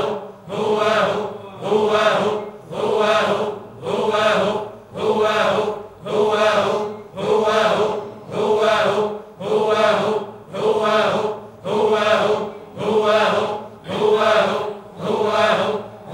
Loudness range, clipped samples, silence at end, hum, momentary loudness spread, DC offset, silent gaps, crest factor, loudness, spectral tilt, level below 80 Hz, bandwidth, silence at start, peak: 1 LU; under 0.1%; 0 s; none; 12 LU; under 0.1%; none; 16 dB; -19 LUFS; -4.5 dB/octave; -60 dBFS; 14 kHz; 0 s; -2 dBFS